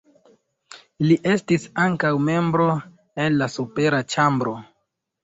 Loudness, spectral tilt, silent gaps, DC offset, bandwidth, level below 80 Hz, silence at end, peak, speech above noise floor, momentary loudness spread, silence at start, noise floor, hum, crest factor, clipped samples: -21 LUFS; -6.5 dB/octave; none; under 0.1%; 8 kHz; -60 dBFS; 0.6 s; -6 dBFS; 54 dB; 7 LU; 0.75 s; -75 dBFS; none; 18 dB; under 0.1%